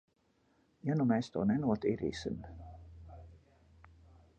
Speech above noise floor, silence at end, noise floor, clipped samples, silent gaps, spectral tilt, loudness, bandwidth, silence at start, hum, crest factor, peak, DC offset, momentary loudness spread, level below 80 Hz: 39 dB; 1 s; -72 dBFS; under 0.1%; none; -7.5 dB/octave; -34 LUFS; 8.8 kHz; 0.85 s; none; 20 dB; -18 dBFS; under 0.1%; 22 LU; -58 dBFS